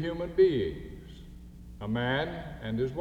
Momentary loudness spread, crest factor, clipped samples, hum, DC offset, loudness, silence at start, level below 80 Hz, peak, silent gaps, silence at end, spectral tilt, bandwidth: 24 LU; 18 dB; under 0.1%; none; under 0.1%; -30 LUFS; 0 s; -48 dBFS; -12 dBFS; none; 0 s; -8 dB/octave; 6.8 kHz